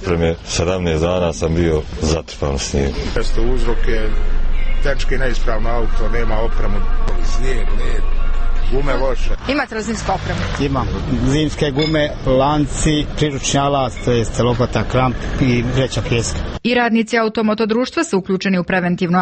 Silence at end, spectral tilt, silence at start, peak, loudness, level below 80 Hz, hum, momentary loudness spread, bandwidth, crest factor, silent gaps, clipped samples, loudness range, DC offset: 0 s; -5.5 dB/octave; 0 s; -4 dBFS; -19 LUFS; -18 dBFS; none; 7 LU; 8.8 kHz; 12 dB; none; under 0.1%; 5 LU; under 0.1%